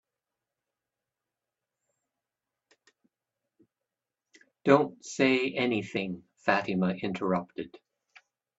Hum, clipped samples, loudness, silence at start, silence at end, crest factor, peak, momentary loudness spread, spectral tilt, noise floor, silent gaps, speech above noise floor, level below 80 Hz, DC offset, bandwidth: none; under 0.1%; -28 LUFS; 4.65 s; 0.9 s; 26 dB; -6 dBFS; 13 LU; -5.5 dB/octave; -89 dBFS; none; 61 dB; -72 dBFS; under 0.1%; 8 kHz